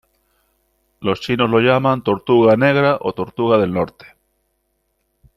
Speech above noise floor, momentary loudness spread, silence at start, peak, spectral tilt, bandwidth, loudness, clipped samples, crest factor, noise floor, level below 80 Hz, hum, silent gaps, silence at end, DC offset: 53 dB; 10 LU; 1 s; -2 dBFS; -7.5 dB/octave; 13 kHz; -16 LUFS; under 0.1%; 16 dB; -69 dBFS; -54 dBFS; none; none; 1.45 s; under 0.1%